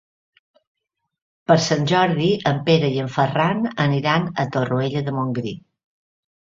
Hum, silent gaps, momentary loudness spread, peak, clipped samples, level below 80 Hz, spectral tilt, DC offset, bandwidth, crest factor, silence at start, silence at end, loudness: none; none; 7 LU; -2 dBFS; under 0.1%; -58 dBFS; -6 dB/octave; under 0.1%; 7.6 kHz; 20 dB; 1.5 s; 0.95 s; -20 LUFS